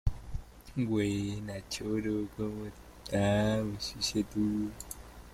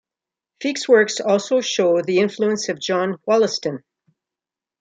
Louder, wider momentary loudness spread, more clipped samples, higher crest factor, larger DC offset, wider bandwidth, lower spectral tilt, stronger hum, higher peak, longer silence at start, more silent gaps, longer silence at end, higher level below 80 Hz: second, -33 LUFS vs -19 LUFS; first, 16 LU vs 10 LU; neither; about the same, 20 dB vs 18 dB; neither; first, 16 kHz vs 9.4 kHz; first, -5.5 dB/octave vs -4 dB/octave; neither; second, -14 dBFS vs -4 dBFS; second, 0.05 s vs 0.6 s; neither; second, 0 s vs 1 s; first, -46 dBFS vs -72 dBFS